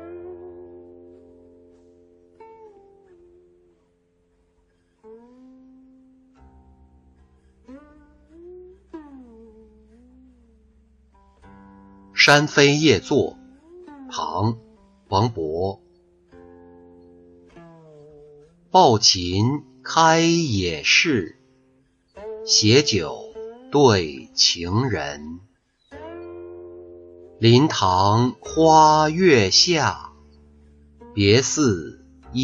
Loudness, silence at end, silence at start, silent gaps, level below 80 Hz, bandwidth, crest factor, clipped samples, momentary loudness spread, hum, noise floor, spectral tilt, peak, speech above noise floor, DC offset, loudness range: -18 LUFS; 0 s; 0 s; none; -54 dBFS; 10.5 kHz; 20 dB; under 0.1%; 25 LU; none; -64 dBFS; -4 dB/octave; -2 dBFS; 46 dB; under 0.1%; 10 LU